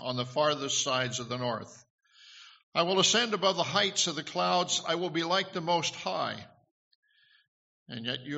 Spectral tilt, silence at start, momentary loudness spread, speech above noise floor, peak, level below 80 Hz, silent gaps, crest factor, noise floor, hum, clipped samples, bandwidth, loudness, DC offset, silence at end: -2 dB/octave; 0 s; 11 LU; 24 dB; -12 dBFS; -74 dBFS; 1.90-1.98 s, 2.63-2.72 s, 6.71-7.03 s, 7.48-7.86 s; 20 dB; -54 dBFS; none; under 0.1%; 8 kHz; -29 LUFS; under 0.1%; 0 s